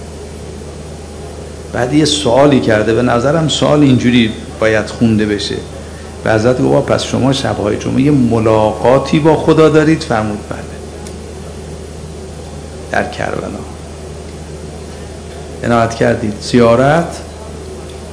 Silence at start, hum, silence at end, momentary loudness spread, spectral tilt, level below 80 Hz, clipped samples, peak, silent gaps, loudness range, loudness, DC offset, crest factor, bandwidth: 0 s; none; 0 s; 19 LU; -6 dB/octave; -34 dBFS; 0.6%; 0 dBFS; none; 12 LU; -12 LUFS; under 0.1%; 14 dB; 11 kHz